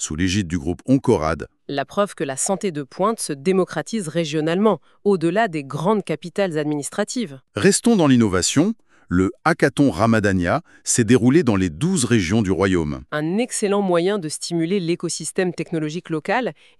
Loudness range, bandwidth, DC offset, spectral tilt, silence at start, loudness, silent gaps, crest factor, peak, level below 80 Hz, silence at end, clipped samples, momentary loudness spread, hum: 4 LU; 13.5 kHz; under 0.1%; -5 dB/octave; 0 s; -20 LUFS; none; 16 dB; -2 dBFS; -46 dBFS; 0.3 s; under 0.1%; 9 LU; none